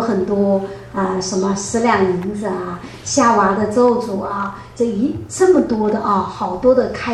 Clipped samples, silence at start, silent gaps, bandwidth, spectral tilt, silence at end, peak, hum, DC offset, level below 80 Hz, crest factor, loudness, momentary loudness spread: under 0.1%; 0 s; none; 12 kHz; -5 dB/octave; 0 s; -2 dBFS; none; under 0.1%; -46 dBFS; 16 dB; -17 LUFS; 9 LU